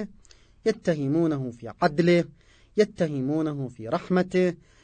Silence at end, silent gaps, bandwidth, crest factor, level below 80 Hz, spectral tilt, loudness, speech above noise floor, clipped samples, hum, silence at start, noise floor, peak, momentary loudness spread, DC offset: 0.3 s; none; 9.2 kHz; 18 dB; -58 dBFS; -7.5 dB/octave; -26 LUFS; 29 dB; under 0.1%; none; 0 s; -54 dBFS; -8 dBFS; 9 LU; under 0.1%